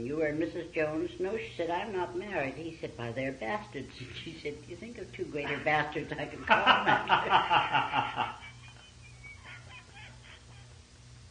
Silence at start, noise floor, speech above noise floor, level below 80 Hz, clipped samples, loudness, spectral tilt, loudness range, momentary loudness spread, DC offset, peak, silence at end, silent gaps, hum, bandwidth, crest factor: 0 s; -53 dBFS; 22 dB; -60 dBFS; under 0.1%; -31 LUFS; -5 dB/octave; 11 LU; 24 LU; under 0.1%; -8 dBFS; 0 s; none; 60 Hz at -55 dBFS; 10 kHz; 26 dB